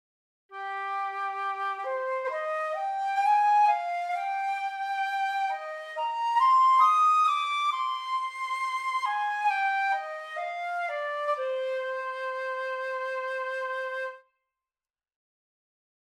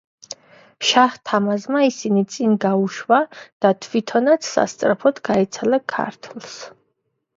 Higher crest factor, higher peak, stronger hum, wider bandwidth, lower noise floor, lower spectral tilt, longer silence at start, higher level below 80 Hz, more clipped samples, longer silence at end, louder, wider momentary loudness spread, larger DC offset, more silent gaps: about the same, 16 dB vs 20 dB; second, -12 dBFS vs 0 dBFS; neither; first, 12.5 kHz vs 7.8 kHz; first, under -90 dBFS vs -72 dBFS; second, 2.5 dB/octave vs -4.5 dB/octave; second, 0.5 s vs 0.8 s; second, -90 dBFS vs -64 dBFS; neither; first, 1.85 s vs 0.7 s; second, -28 LUFS vs -19 LUFS; second, 12 LU vs 18 LU; neither; second, none vs 3.52-3.60 s